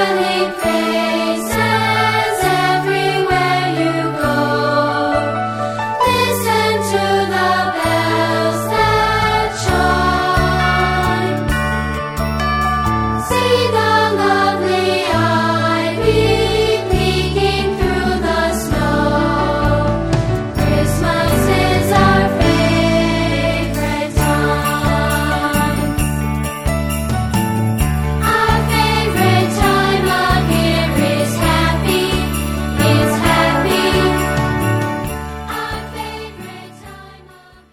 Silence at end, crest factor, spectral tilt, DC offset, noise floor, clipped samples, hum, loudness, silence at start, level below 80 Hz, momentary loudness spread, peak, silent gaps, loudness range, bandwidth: 0.55 s; 14 dB; -5 dB/octave; under 0.1%; -43 dBFS; under 0.1%; none; -15 LUFS; 0 s; -26 dBFS; 6 LU; 0 dBFS; none; 3 LU; 17 kHz